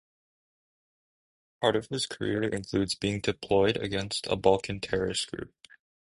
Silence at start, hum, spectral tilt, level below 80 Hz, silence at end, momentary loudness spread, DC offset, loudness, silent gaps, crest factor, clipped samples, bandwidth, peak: 1.6 s; none; -4.5 dB/octave; -54 dBFS; 0.7 s; 7 LU; under 0.1%; -29 LUFS; none; 24 dB; under 0.1%; 11.5 kHz; -6 dBFS